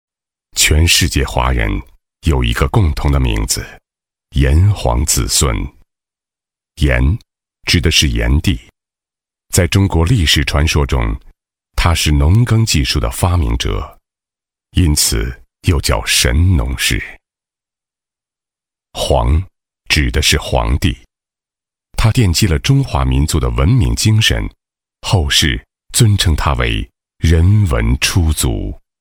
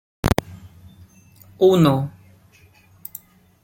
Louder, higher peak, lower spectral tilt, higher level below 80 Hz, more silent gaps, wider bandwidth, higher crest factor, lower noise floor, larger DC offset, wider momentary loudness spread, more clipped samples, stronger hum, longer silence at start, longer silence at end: first, -14 LUFS vs -19 LUFS; about the same, 0 dBFS vs -2 dBFS; second, -4 dB/octave vs -7 dB/octave; first, -20 dBFS vs -42 dBFS; neither; about the same, 18 kHz vs 17 kHz; second, 14 dB vs 22 dB; first, -89 dBFS vs -53 dBFS; neither; second, 12 LU vs 25 LU; neither; neither; first, 0.55 s vs 0.25 s; second, 0.2 s vs 1.55 s